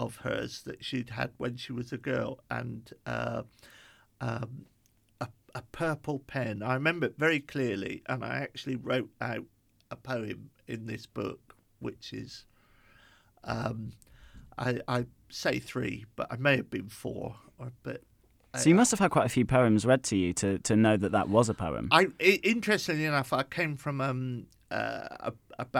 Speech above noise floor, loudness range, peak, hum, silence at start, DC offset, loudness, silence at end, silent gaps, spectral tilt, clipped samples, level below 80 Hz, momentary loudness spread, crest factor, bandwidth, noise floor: 31 dB; 14 LU; -6 dBFS; none; 0 s; under 0.1%; -30 LUFS; 0 s; none; -5 dB/octave; under 0.1%; -58 dBFS; 18 LU; 24 dB; 16.5 kHz; -62 dBFS